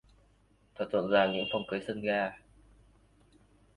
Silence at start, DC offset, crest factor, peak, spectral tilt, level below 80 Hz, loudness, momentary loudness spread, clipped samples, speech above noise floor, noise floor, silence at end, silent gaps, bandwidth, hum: 0.8 s; under 0.1%; 20 dB; -14 dBFS; -6.5 dB/octave; -64 dBFS; -31 LUFS; 10 LU; under 0.1%; 36 dB; -66 dBFS; 1.4 s; none; 11 kHz; none